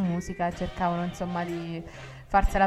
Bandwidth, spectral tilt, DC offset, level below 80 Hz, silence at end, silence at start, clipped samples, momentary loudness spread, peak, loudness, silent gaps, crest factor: 14 kHz; -6.5 dB/octave; under 0.1%; -36 dBFS; 0 s; 0 s; under 0.1%; 12 LU; -8 dBFS; -30 LUFS; none; 20 dB